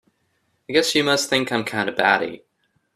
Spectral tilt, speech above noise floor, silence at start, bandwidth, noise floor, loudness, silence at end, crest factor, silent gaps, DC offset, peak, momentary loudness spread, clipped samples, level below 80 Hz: -3 dB/octave; 48 dB; 0.7 s; 15 kHz; -68 dBFS; -20 LUFS; 0.6 s; 22 dB; none; under 0.1%; 0 dBFS; 5 LU; under 0.1%; -62 dBFS